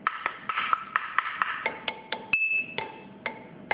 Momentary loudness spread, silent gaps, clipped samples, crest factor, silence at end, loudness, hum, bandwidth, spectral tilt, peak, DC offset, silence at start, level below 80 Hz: 13 LU; none; under 0.1%; 26 dB; 0 s; -29 LUFS; none; 5.2 kHz; -6 dB/octave; -6 dBFS; under 0.1%; 0 s; -70 dBFS